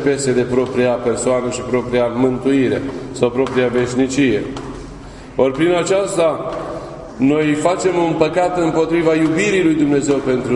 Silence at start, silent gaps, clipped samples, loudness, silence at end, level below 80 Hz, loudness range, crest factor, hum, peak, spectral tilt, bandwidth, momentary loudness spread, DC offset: 0 s; none; under 0.1%; -16 LUFS; 0 s; -42 dBFS; 3 LU; 16 dB; none; 0 dBFS; -5.5 dB/octave; 11 kHz; 11 LU; under 0.1%